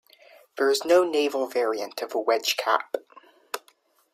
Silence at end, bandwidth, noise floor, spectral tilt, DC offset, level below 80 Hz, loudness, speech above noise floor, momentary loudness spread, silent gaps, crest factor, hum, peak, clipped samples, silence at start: 0.55 s; 16 kHz; -63 dBFS; -1 dB/octave; under 0.1%; -78 dBFS; -24 LUFS; 39 dB; 17 LU; none; 20 dB; none; -6 dBFS; under 0.1%; 0.55 s